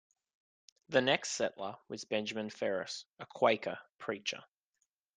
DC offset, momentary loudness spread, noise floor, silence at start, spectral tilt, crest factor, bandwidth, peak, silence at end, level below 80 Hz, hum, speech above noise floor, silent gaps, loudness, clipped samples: under 0.1%; 14 LU; -83 dBFS; 0.9 s; -3 dB/octave; 24 dB; 9.8 kHz; -12 dBFS; 0.75 s; -80 dBFS; none; 48 dB; 3.12-3.16 s, 3.89-3.95 s; -35 LUFS; under 0.1%